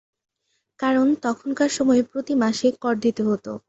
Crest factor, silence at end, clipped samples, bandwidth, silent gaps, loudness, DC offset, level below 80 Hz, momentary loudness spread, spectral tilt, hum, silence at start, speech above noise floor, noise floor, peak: 16 dB; 0.1 s; under 0.1%; 8.2 kHz; none; -22 LUFS; under 0.1%; -64 dBFS; 5 LU; -4.5 dB/octave; none; 0.8 s; 53 dB; -74 dBFS; -8 dBFS